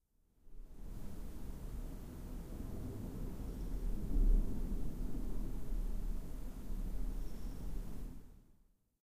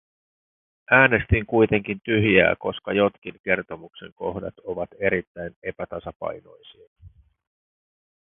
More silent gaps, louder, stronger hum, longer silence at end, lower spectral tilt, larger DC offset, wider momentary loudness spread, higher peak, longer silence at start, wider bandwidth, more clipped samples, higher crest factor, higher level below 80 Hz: second, none vs 3.18-3.22 s, 3.40-3.44 s, 4.12-4.16 s, 5.27-5.35 s, 5.56-5.62 s, 6.16-6.20 s, 6.87-6.96 s; second, -45 LUFS vs -22 LUFS; neither; second, 0.5 s vs 1.2 s; second, -7.5 dB/octave vs -10.5 dB/octave; neither; second, 13 LU vs 17 LU; second, -20 dBFS vs 0 dBFS; second, 0.45 s vs 0.9 s; first, 15.5 kHz vs 3.9 kHz; neither; second, 18 dB vs 24 dB; about the same, -40 dBFS vs -44 dBFS